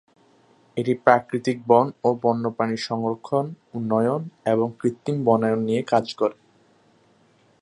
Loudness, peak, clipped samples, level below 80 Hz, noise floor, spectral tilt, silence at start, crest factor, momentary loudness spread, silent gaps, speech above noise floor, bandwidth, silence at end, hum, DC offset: -23 LUFS; 0 dBFS; under 0.1%; -68 dBFS; -59 dBFS; -7 dB/octave; 0.75 s; 22 dB; 8 LU; none; 37 dB; 11 kHz; 1.3 s; none; under 0.1%